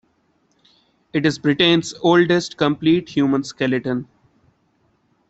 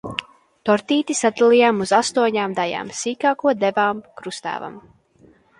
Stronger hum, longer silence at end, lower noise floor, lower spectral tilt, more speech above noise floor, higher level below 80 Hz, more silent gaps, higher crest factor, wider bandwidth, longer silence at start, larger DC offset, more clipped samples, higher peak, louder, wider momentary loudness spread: neither; first, 1.25 s vs 0.8 s; first, -63 dBFS vs -54 dBFS; first, -5.5 dB/octave vs -3.5 dB/octave; first, 46 dB vs 34 dB; about the same, -58 dBFS vs -62 dBFS; neither; about the same, 18 dB vs 18 dB; second, 8.2 kHz vs 11 kHz; first, 1.15 s vs 0.05 s; neither; neither; about the same, -2 dBFS vs -2 dBFS; about the same, -18 LUFS vs -19 LUFS; second, 7 LU vs 15 LU